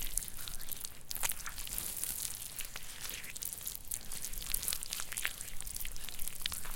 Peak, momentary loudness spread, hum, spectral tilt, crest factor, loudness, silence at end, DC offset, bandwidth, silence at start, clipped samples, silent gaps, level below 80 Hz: -8 dBFS; 6 LU; none; 0 dB/octave; 30 dB; -39 LUFS; 0 s; under 0.1%; 17 kHz; 0 s; under 0.1%; none; -48 dBFS